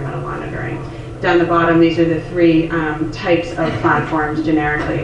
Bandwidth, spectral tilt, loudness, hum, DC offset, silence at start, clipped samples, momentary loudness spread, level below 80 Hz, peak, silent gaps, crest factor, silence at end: 8.4 kHz; -7.5 dB/octave; -16 LUFS; none; under 0.1%; 0 s; under 0.1%; 11 LU; -36 dBFS; 0 dBFS; none; 16 dB; 0 s